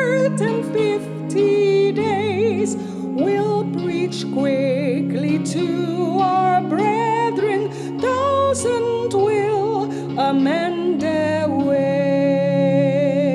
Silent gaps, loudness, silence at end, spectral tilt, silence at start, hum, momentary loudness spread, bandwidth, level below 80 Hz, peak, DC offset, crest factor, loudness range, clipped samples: none; -19 LUFS; 0 s; -6.5 dB/octave; 0 s; none; 5 LU; 12 kHz; -60 dBFS; -6 dBFS; under 0.1%; 12 dB; 2 LU; under 0.1%